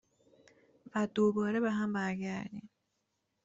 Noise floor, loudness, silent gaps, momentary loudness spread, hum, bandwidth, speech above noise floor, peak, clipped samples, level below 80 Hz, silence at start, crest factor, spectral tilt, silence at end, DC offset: -82 dBFS; -33 LUFS; none; 12 LU; none; 7.8 kHz; 49 dB; -18 dBFS; under 0.1%; -74 dBFS; 0.95 s; 18 dB; -7 dB/octave; 0.8 s; under 0.1%